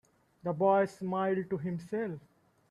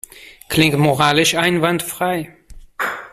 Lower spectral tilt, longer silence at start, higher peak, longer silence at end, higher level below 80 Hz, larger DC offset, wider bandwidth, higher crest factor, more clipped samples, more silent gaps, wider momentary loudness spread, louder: first, -8 dB/octave vs -4 dB/octave; first, 0.45 s vs 0.15 s; second, -16 dBFS vs -2 dBFS; first, 0.5 s vs 0.05 s; second, -74 dBFS vs -46 dBFS; neither; second, 11.5 kHz vs 16 kHz; about the same, 18 dB vs 16 dB; neither; neither; about the same, 12 LU vs 11 LU; second, -32 LUFS vs -17 LUFS